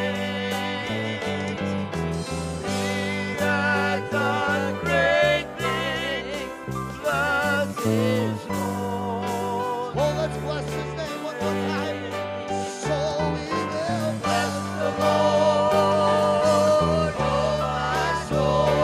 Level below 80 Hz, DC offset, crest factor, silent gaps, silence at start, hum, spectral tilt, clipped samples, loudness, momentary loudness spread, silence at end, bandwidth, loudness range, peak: -46 dBFS; under 0.1%; 16 dB; none; 0 s; none; -5 dB/octave; under 0.1%; -24 LUFS; 9 LU; 0 s; 15.5 kHz; 6 LU; -8 dBFS